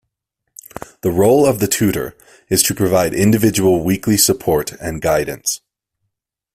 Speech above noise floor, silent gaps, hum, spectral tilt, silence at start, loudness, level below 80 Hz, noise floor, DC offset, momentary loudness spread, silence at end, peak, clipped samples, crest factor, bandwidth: 60 dB; none; none; -4.5 dB/octave; 1.05 s; -15 LUFS; -44 dBFS; -76 dBFS; under 0.1%; 12 LU; 1 s; 0 dBFS; under 0.1%; 16 dB; 16 kHz